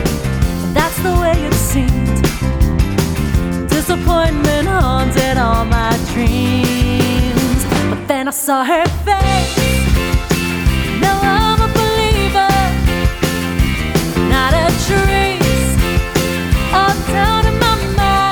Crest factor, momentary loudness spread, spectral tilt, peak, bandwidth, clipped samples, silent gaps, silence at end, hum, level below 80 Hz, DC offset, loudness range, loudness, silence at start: 14 dB; 4 LU; -5 dB/octave; 0 dBFS; over 20 kHz; under 0.1%; none; 0 s; none; -20 dBFS; under 0.1%; 1 LU; -14 LUFS; 0 s